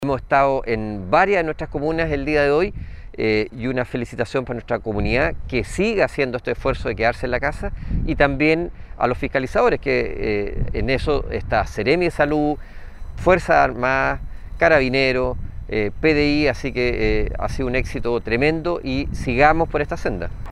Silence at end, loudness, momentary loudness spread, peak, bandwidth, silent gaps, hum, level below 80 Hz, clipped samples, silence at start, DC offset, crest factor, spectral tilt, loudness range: 0 s; -20 LUFS; 9 LU; 0 dBFS; 12 kHz; none; none; -30 dBFS; under 0.1%; 0 s; under 0.1%; 20 dB; -6.5 dB/octave; 3 LU